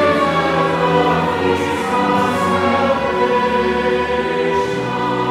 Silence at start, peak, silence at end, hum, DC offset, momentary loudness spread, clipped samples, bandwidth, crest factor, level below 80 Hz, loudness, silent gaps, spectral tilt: 0 s; -2 dBFS; 0 s; none; under 0.1%; 3 LU; under 0.1%; 15.5 kHz; 14 dB; -44 dBFS; -16 LUFS; none; -5.5 dB/octave